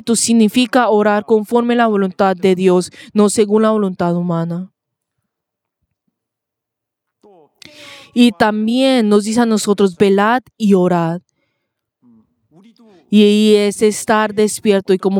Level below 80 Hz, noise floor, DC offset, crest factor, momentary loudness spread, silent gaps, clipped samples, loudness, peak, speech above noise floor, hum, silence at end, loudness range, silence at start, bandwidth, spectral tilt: -60 dBFS; -81 dBFS; under 0.1%; 14 dB; 6 LU; none; under 0.1%; -14 LUFS; 0 dBFS; 68 dB; none; 0 s; 8 LU; 0.05 s; 16 kHz; -5 dB/octave